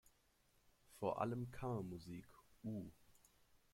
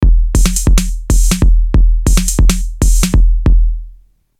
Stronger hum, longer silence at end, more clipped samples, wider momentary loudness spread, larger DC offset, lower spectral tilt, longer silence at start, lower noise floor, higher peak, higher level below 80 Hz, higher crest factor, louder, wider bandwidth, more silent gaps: neither; about the same, 0.55 s vs 0.5 s; neither; first, 14 LU vs 4 LU; neither; first, -7.5 dB/octave vs -4.5 dB/octave; first, 0.9 s vs 0 s; first, -77 dBFS vs -41 dBFS; second, -26 dBFS vs 0 dBFS; second, -72 dBFS vs -10 dBFS; first, 22 dB vs 10 dB; second, -47 LUFS vs -13 LUFS; first, 16.5 kHz vs 14.5 kHz; neither